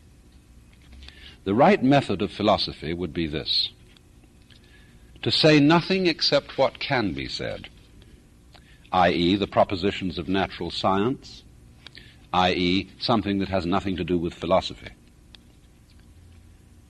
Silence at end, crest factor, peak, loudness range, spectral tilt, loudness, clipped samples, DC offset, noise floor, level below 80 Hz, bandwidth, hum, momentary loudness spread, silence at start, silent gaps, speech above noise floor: 1.95 s; 18 dB; -6 dBFS; 5 LU; -6 dB/octave; -23 LUFS; under 0.1%; under 0.1%; -53 dBFS; -50 dBFS; 12 kHz; none; 13 LU; 0.9 s; none; 30 dB